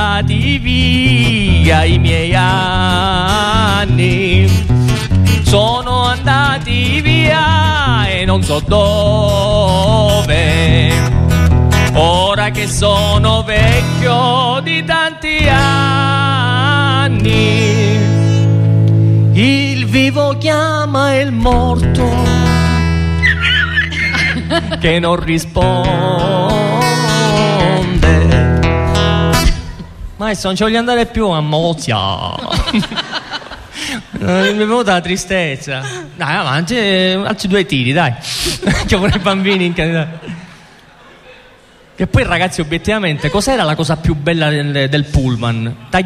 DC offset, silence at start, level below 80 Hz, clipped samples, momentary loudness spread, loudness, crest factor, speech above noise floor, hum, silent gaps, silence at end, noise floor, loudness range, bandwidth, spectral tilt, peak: under 0.1%; 0 s; -24 dBFS; under 0.1%; 6 LU; -12 LUFS; 12 dB; 31 dB; none; none; 0 s; -43 dBFS; 5 LU; 14.5 kHz; -5.5 dB/octave; 0 dBFS